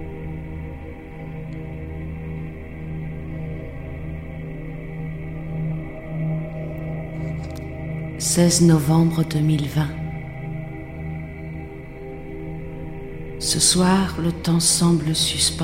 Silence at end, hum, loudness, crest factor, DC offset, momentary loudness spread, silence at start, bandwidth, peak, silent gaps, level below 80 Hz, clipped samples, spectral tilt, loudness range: 0 s; none; -23 LUFS; 20 dB; under 0.1%; 18 LU; 0 s; 16 kHz; -4 dBFS; none; -38 dBFS; under 0.1%; -4.5 dB/octave; 13 LU